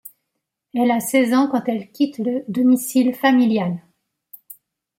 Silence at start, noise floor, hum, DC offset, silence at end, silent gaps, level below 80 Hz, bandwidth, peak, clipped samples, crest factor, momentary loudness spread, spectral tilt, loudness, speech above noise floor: 0.05 s; -78 dBFS; none; under 0.1%; 0.45 s; none; -70 dBFS; 17 kHz; -4 dBFS; under 0.1%; 16 dB; 9 LU; -5 dB/octave; -19 LUFS; 60 dB